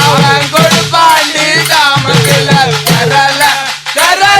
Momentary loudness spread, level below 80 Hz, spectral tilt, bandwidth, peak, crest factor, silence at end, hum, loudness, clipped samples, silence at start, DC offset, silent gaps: 3 LU; -42 dBFS; -3 dB/octave; over 20 kHz; 0 dBFS; 8 dB; 0 s; none; -7 LUFS; 1%; 0 s; under 0.1%; none